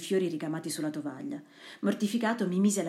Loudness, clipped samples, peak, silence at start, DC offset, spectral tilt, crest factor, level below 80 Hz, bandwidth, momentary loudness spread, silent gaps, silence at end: -31 LUFS; under 0.1%; -16 dBFS; 0 s; under 0.1%; -5 dB/octave; 16 dB; -84 dBFS; 14.5 kHz; 13 LU; none; 0 s